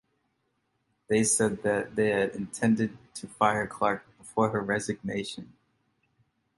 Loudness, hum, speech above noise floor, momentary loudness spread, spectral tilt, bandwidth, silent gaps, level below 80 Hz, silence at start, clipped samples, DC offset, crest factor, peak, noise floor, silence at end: -28 LUFS; none; 48 dB; 11 LU; -4.5 dB/octave; 11.5 kHz; none; -62 dBFS; 1.1 s; under 0.1%; under 0.1%; 22 dB; -8 dBFS; -76 dBFS; 1.15 s